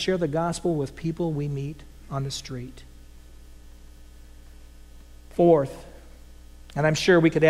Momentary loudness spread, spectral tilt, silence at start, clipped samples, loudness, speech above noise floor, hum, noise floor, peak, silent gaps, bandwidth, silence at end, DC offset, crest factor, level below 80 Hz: 18 LU; -6 dB/octave; 0 s; under 0.1%; -25 LUFS; 23 dB; none; -46 dBFS; -6 dBFS; none; 14.5 kHz; 0 s; under 0.1%; 20 dB; -46 dBFS